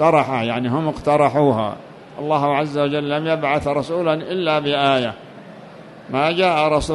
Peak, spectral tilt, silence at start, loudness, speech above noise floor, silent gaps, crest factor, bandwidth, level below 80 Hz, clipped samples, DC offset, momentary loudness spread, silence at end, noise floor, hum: -4 dBFS; -6 dB/octave; 0 s; -19 LUFS; 21 dB; none; 16 dB; 11.5 kHz; -46 dBFS; under 0.1%; under 0.1%; 20 LU; 0 s; -39 dBFS; none